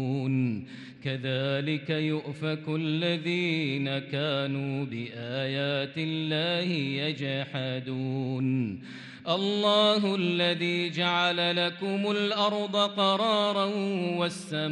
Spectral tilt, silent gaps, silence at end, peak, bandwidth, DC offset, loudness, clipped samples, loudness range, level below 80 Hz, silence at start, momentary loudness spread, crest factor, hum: -6 dB/octave; none; 0 s; -10 dBFS; 11.5 kHz; under 0.1%; -28 LUFS; under 0.1%; 4 LU; -74 dBFS; 0 s; 8 LU; 18 dB; none